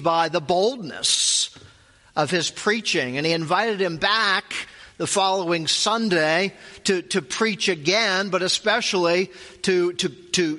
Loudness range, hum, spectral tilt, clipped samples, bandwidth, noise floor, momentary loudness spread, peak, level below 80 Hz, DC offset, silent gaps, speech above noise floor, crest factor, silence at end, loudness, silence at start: 1 LU; none; -2.5 dB/octave; under 0.1%; 11.5 kHz; -53 dBFS; 8 LU; -4 dBFS; -62 dBFS; under 0.1%; none; 31 dB; 18 dB; 0 s; -21 LUFS; 0 s